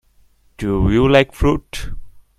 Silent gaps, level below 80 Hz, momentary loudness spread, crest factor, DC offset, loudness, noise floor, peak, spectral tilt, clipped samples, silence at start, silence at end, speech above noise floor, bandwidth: none; -28 dBFS; 18 LU; 18 dB; under 0.1%; -16 LUFS; -53 dBFS; 0 dBFS; -6.5 dB/octave; under 0.1%; 0.6 s; 0.2 s; 38 dB; 14.5 kHz